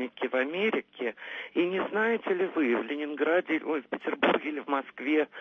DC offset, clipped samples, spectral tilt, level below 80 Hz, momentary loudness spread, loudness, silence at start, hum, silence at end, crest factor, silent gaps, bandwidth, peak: under 0.1%; under 0.1%; -6.5 dB/octave; -80 dBFS; 7 LU; -29 LUFS; 0 s; none; 0 s; 18 dB; none; 6.4 kHz; -10 dBFS